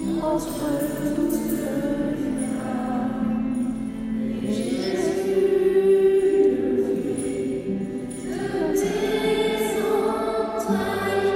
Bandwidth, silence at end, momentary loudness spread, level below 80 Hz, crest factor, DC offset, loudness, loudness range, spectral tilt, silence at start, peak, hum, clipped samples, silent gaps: 16 kHz; 0 s; 9 LU; -48 dBFS; 14 dB; under 0.1%; -24 LUFS; 5 LU; -5.5 dB/octave; 0 s; -8 dBFS; none; under 0.1%; none